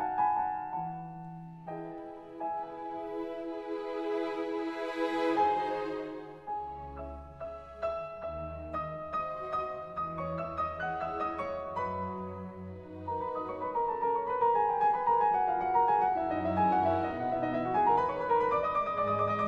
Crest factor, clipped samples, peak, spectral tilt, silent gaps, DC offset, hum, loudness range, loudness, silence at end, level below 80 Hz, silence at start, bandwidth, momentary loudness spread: 16 dB; under 0.1%; -16 dBFS; -7.5 dB/octave; none; under 0.1%; none; 10 LU; -32 LUFS; 0 s; -58 dBFS; 0 s; 8.4 kHz; 15 LU